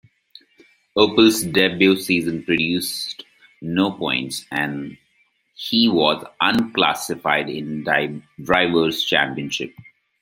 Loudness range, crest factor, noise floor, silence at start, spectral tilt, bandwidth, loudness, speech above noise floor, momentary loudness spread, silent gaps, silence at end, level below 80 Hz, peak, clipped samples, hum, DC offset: 4 LU; 20 dB; -64 dBFS; 0.95 s; -4 dB/octave; 16.5 kHz; -19 LUFS; 44 dB; 12 LU; none; 0.4 s; -56 dBFS; -2 dBFS; under 0.1%; none; under 0.1%